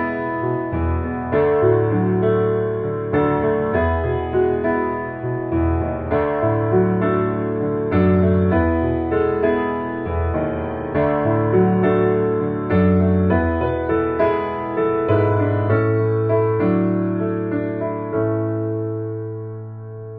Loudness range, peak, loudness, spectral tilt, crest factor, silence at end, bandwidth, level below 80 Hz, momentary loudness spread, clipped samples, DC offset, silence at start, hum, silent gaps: 2 LU; -4 dBFS; -19 LUFS; -8.5 dB/octave; 14 dB; 0 s; 4.4 kHz; -36 dBFS; 7 LU; under 0.1%; under 0.1%; 0 s; none; none